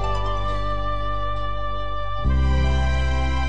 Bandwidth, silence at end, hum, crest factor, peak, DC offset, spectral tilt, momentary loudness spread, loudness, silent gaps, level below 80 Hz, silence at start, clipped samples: 8.2 kHz; 0 s; 50 Hz at -35 dBFS; 12 dB; -10 dBFS; 5%; -6.5 dB/octave; 7 LU; -25 LUFS; none; -24 dBFS; 0 s; under 0.1%